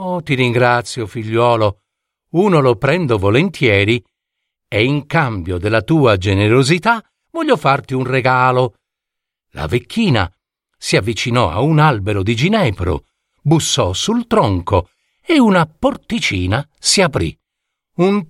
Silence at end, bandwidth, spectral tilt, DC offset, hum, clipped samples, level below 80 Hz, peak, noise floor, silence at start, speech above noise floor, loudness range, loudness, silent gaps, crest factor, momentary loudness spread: 0.05 s; 14 kHz; -5.5 dB/octave; under 0.1%; none; under 0.1%; -40 dBFS; 0 dBFS; -81 dBFS; 0 s; 66 dB; 2 LU; -15 LUFS; none; 16 dB; 9 LU